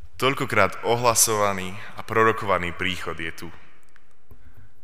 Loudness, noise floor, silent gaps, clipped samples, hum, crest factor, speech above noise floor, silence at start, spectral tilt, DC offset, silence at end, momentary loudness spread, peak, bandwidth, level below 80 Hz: -22 LUFS; -60 dBFS; none; under 0.1%; none; 24 dB; 36 dB; 0.05 s; -3 dB/octave; 2%; 1.3 s; 16 LU; -2 dBFS; 16 kHz; -54 dBFS